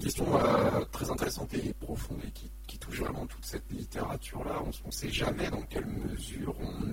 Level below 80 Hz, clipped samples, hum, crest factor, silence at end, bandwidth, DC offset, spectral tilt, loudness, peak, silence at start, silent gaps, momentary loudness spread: -44 dBFS; under 0.1%; none; 20 dB; 0 s; 16 kHz; under 0.1%; -5 dB/octave; -34 LUFS; -14 dBFS; 0 s; none; 13 LU